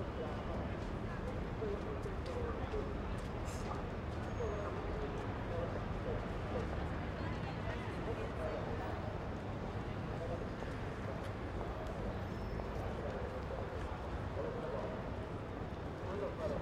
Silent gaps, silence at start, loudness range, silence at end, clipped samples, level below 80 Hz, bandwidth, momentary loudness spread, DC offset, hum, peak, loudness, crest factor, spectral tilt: none; 0 s; 2 LU; 0 s; under 0.1%; -48 dBFS; 13.5 kHz; 3 LU; under 0.1%; none; -28 dBFS; -42 LUFS; 14 dB; -7 dB/octave